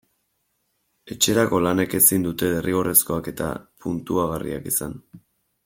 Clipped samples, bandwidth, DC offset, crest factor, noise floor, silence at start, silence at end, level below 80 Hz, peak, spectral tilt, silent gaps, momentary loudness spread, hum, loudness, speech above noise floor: under 0.1%; 16.5 kHz; under 0.1%; 24 dB; -72 dBFS; 1.05 s; 0.5 s; -52 dBFS; 0 dBFS; -3.5 dB/octave; none; 14 LU; none; -21 LUFS; 50 dB